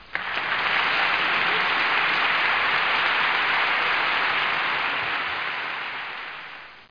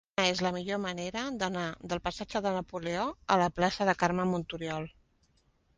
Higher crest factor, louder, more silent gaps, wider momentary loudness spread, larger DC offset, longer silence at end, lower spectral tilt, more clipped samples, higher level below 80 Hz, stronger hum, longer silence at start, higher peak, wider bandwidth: second, 16 dB vs 22 dB; first, -22 LUFS vs -31 LUFS; neither; about the same, 10 LU vs 8 LU; first, 0.2% vs under 0.1%; second, 0.05 s vs 0.85 s; second, -3 dB/octave vs -4.5 dB/octave; neither; about the same, -62 dBFS vs -58 dBFS; neither; second, 0 s vs 0.2 s; about the same, -8 dBFS vs -10 dBFS; second, 5.4 kHz vs 10 kHz